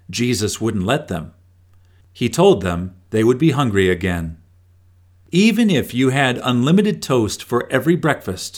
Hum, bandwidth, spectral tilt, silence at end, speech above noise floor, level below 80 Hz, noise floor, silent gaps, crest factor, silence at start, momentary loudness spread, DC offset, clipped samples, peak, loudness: none; 19 kHz; -5.5 dB/octave; 0 s; 34 dB; -46 dBFS; -51 dBFS; none; 16 dB; 0.1 s; 9 LU; under 0.1%; under 0.1%; -2 dBFS; -18 LUFS